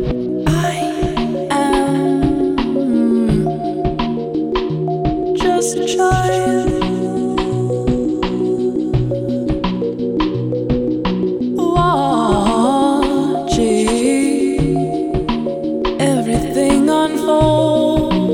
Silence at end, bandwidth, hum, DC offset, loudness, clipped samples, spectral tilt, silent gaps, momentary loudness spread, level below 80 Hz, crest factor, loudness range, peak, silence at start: 0 s; 16.5 kHz; none; under 0.1%; -16 LUFS; under 0.1%; -6 dB/octave; none; 5 LU; -32 dBFS; 14 dB; 3 LU; 0 dBFS; 0 s